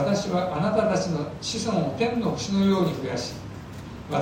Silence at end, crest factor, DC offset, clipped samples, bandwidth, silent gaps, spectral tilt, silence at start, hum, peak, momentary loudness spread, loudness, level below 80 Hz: 0 s; 16 dB; under 0.1%; under 0.1%; 16 kHz; none; -5.5 dB/octave; 0 s; none; -10 dBFS; 16 LU; -25 LUFS; -50 dBFS